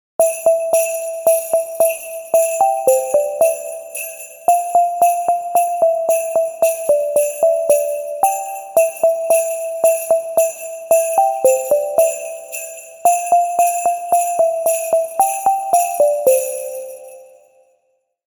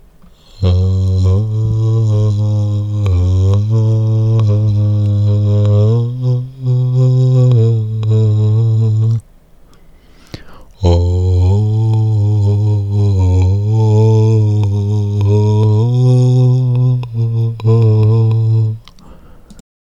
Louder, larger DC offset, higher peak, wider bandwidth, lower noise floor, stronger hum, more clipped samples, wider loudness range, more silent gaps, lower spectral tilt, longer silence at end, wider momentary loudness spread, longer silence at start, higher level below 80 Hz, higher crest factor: second, -16 LUFS vs -13 LUFS; neither; about the same, -2 dBFS vs 0 dBFS; first, 19.5 kHz vs 7.4 kHz; first, -66 dBFS vs -42 dBFS; neither; neither; second, 1 LU vs 4 LU; neither; second, -1.5 dB/octave vs -9.5 dB/octave; first, 1.05 s vs 0.35 s; first, 11 LU vs 5 LU; second, 0.2 s vs 0.55 s; second, -68 dBFS vs -34 dBFS; about the same, 14 dB vs 12 dB